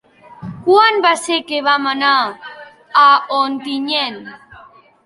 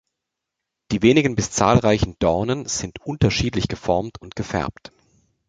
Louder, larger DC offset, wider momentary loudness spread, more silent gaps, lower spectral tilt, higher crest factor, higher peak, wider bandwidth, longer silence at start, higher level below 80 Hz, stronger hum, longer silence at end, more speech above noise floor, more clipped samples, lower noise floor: first, -14 LUFS vs -21 LUFS; neither; first, 23 LU vs 11 LU; neither; second, -3 dB/octave vs -5 dB/octave; about the same, 16 dB vs 20 dB; about the same, 0 dBFS vs -2 dBFS; first, 11.5 kHz vs 9.4 kHz; second, 0.3 s vs 0.9 s; second, -60 dBFS vs -40 dBFS; neither; second, 0.45 s vs 0.8 s; second, 29 dB vs 62 dB; neither; second, -44 dBFS vs -82 dBFS